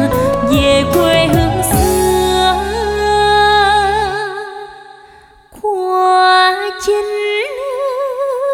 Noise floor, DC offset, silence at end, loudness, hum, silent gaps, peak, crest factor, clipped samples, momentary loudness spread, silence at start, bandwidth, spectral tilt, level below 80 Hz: -42 dBFS; under 0.1%; 0 s; -13 LUFS; none; none; 0 dBFS; 14 dB; under 0.1%; 10 LU; 0 s; 19 kHz; -4.5 dB/octave; -30 dBFS